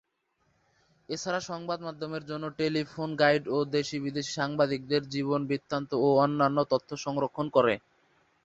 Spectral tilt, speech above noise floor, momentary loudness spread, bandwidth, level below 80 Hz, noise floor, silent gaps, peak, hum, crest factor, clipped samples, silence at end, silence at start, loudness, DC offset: -5.5 dB/octave; 46 dB; 11 LU; 8 kHz; -68 dBFS; -74 dBFS; none; -8 dBFS; none; 22 dB; under 0.1%; 0.65 s; 1.1 s; -29 LUFS; under 0.1%